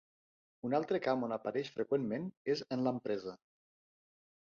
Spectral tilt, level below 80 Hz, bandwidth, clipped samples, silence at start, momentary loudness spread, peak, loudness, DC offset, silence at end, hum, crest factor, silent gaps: -5 dB/octave; -80 dBFS; 7.2 kHz; under 0.1%; 0.65 s; 6 LU; -20 dBFS; -37 LUFS; under 0.1%; 1.15 s; none; 18 dB; 2.37-2.45 s